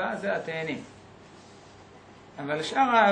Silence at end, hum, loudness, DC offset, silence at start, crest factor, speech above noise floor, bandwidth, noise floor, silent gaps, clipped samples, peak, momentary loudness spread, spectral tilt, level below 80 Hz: 0 s; none; -28 LUFS; under 0.1%; 0 s; 20 dB; 25 dB; 9.8 kHz; -51 dBFS; none; under 0.1%; -8 dBFS; 27 LU; -4.5 dB/octave; -68 dBFS